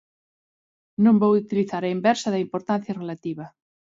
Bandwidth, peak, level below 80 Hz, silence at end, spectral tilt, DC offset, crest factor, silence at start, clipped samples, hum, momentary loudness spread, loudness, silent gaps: 7.8 kHz; -6 dBFS; -68 dBFS; 0.45 s; -6.5 dB/octave; under 0.1%; 18 dB; 1 s; under 0.1%; none; 16 LU; -23 LUFS; none